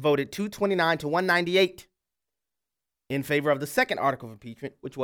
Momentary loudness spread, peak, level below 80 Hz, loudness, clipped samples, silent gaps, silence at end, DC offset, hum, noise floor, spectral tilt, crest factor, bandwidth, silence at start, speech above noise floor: 15 LU; -8 dBFS; -64 dBFS; -25 LUFS; under 0.1%; none; 0 s; under 0.1%; none; -88 dBFS; -5 dB/octave; 18 dB; 18.5 kHz; 0 s; 63 dB